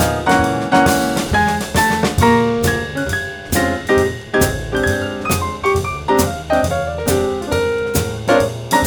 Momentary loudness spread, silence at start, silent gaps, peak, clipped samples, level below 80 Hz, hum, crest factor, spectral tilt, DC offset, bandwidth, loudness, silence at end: 6 LU; 0 s; none; 0 dBFS; under 0.1%; -32 dBFS; none; 16 dB; -4.5 dB/octave; under 0.1%; over 20 kHz; -17 LUFS; 0 s